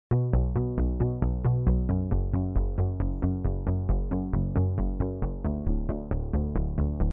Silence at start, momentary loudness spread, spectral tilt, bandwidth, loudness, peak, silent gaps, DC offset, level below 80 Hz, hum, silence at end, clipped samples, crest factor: 0.1 s; 5 LU; -13.5 dB/octave; 2.7 kHz; -29 LUFS; -12 dBFS; none; under 0.1%; -30 dBFS; none; 0 s; under 0.1%; 14 dB